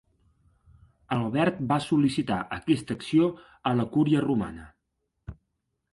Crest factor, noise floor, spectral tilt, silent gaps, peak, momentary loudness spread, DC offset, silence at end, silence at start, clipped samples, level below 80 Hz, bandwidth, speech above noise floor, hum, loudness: 18 dB; -79 dBFS; -7 dB/octave; none; -10 dBFS; 21 LU; under 0.1%; 0.6 s; 1.1 s; under 0.1%; -56 dBFS; 11.5 kHz; 54 dB; none; -26 LUFS